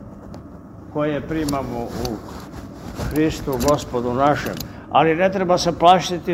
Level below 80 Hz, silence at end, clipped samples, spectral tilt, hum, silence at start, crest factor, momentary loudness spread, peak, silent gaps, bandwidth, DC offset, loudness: -40 dBFS; 0 s; under 0.1%; -5.5 dB/octave; none; 0 s; 20 dB; 21 LU; 0 dBFS; none; 16 kHz; under 0.1%; -20 LUFS